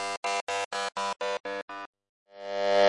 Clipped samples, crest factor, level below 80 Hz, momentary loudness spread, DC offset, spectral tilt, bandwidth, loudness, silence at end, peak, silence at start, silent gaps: under 0.1%; 18 dB; -80 dBFS; 12 LU; under 0.1%; -1.5 dB/octave; 11.5 kHz; -32 LUFS; 0 s; -12 dBFS; 0 s; 0.17-0.23 s, 0.41-0.47 s, 0.65-0.71 s, 1.40-1.44 s, 1.62-1.68 s, 1.86-1.93 s, 2.09-2.26 s